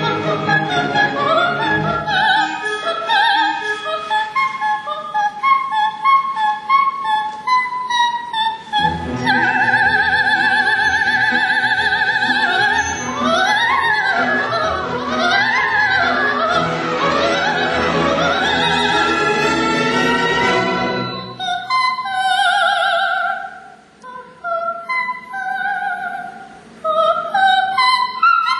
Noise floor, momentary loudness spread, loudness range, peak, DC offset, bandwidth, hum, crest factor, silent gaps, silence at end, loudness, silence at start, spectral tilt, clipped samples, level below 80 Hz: -40 dBFS; 8 LU; 4 LU; -2 dBFS; under 0.1%; 12 kHz; none; 14 dB; none; 0 s; -16 LUFS; 0 s; -3.5 dB/octave; under 0.1%; -46 dBFS